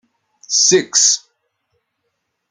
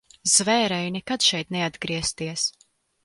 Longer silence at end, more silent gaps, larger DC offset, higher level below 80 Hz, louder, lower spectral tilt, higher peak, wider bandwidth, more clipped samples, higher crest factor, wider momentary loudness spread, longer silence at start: first, 1.35 s vs 0.55 s; neither; neither; second, -68 dBFS vs -56 dBFS; first, -13 LUFS vs -23 LUFS; second, -0.5 dB/octave vs -2 dB/octave; about the same, -2 dBFS vs -4 dBFS; about the same, 11 kHz vs 11.5 kHz; neither; about the same, 18 dB vs 20 dB; about the same, 7 LU vs 9 LU; first, 0.5 s vs 0.25 s